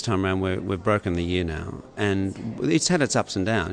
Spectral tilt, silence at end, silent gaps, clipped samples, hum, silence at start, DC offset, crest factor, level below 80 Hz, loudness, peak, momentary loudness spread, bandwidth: -5 dB/octave; 0 s; none; under 0.1%; none; 0 s; under 0.1%; 18 dB; -46 dBFS; -24 LUFS; -6 dBFS; 9 LU; 10.5 kHz